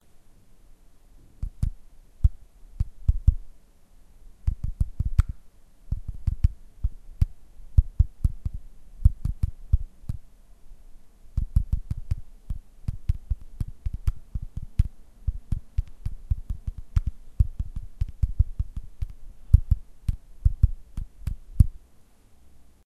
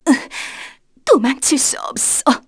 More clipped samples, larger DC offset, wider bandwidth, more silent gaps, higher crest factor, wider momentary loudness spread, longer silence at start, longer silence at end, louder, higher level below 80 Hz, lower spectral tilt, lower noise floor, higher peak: neither; neither; about the same, 11 kHz vs 11 kHz; neither; first, 26 dB vs 16 dB; about the same, 14 LU vs 15 LU; about the same, 0.15 s vs 0.05 s; first, 0.25 s vs 0.1 s; second, -30 LUFS vs -15 LUFS; first, -28 dBFS vs -54 dBFS; first, -8.5 dB/octave vs -1.5 dB/octave; first, -53 dBFS vs -38 dBFS; about the same, -2 dBFS vs 0 dBFS